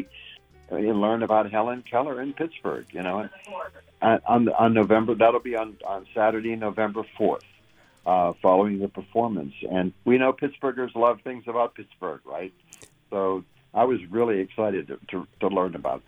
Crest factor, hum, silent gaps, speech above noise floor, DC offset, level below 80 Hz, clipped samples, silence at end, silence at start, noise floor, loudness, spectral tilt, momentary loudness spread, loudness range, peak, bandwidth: 20 dB; none; none; 34 dB; under 0.1%; -62 dBFS; under 0.1%; 0.1 s; 0 s; -58 dBFS; -25 LUFS; -7.5 dB/octave; 14 LU; 5 LU; -4 dBFS; 11 kHz